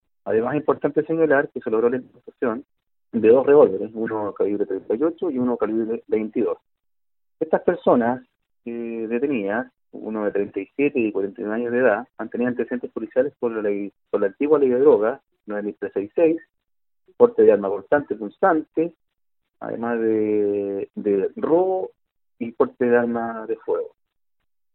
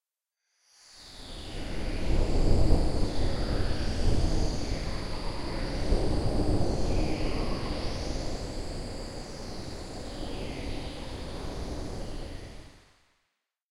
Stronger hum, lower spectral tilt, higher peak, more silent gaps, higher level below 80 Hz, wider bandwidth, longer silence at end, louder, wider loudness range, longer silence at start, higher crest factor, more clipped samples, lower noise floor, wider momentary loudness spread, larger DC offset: neither; first, -11.5 dB/octave vs -6 dB/octave; first, -2 dBFS vs -6 dBFS; neither; second, -66 dBFS vs -32 dBFS; second, 4 kHz vs 11.5 kHz; about the same, 0.85 s vs 0.95 s; first, -22 LUFS vs -33 LUFS; second, 4 LU vs 9 LU; second, 0.25 s vs 0.9 s; about the same, 20 dB vs 22 dB; neither; first, under -90 dBFS vs -85 dBFS; about the same, 13 LU vs 12 LU; neither